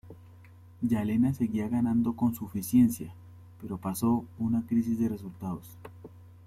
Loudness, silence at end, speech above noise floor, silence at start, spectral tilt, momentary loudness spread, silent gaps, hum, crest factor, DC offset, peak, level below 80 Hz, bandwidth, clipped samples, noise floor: -29 LUFS; 0.15 s; 24 dB; 0.05 s; -7.5 dB/octave; 15 LU; none; none; 16 dB; under 0.1%; -14 dBFS; -60 dBFS; 16 kHz; under 0.1%; -52 dBFS